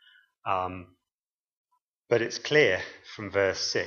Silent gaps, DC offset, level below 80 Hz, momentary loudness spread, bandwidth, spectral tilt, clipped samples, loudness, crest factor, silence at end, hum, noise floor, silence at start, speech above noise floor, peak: 1.12-1.44 s, 1.52-1.65 s, 1.82-1.92 s, 1.99-2.03 s; under 0.1%; -68 dBFS; 17 LU; 7.2 kHz; -3.5 dB/octave; under 0.1%; -27 LUFS; 24 dB; 0 s; none; under -90 dBFS; 0.45 s; over 63 dB; -6 dBFS